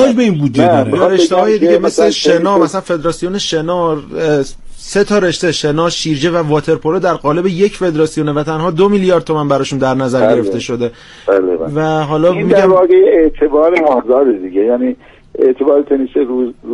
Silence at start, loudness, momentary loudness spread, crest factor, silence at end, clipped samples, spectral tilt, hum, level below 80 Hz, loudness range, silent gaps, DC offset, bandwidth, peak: 0 s; -12 LUFS; 7 LU; 12 dB; 0 s; under 0.1%; -5.5 dB/octave; none; -38 dBFS; 4 LU; none; under 0.1%; 11.5 kHz; 0 dBFS